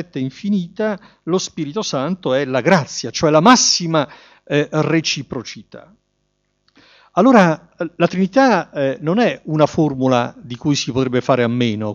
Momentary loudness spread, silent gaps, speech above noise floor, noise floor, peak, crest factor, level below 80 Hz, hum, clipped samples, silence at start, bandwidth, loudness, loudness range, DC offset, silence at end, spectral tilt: 13 LU; none; 51 dB; -68 dBFS; 0 dBFS; 18 dB; -56 dBFS; none; under 0.1%; 0 s; 7.8 kHz; -17 LUFS; 4 LU; under 0.1%; 0 s; -4.5 dB/octave